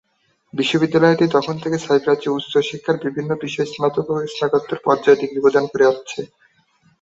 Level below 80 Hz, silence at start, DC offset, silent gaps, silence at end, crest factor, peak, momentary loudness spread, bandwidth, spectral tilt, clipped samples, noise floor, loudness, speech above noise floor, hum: -62 dBFS; 0.55 s; under 0.1%; none; 0.75 s; 16 dB; -2 dBFS; 9 LU; 8 kHz; -6 dB/octave; under 0.1%; -64 dBFS; -18 LUFS; 46 dB; none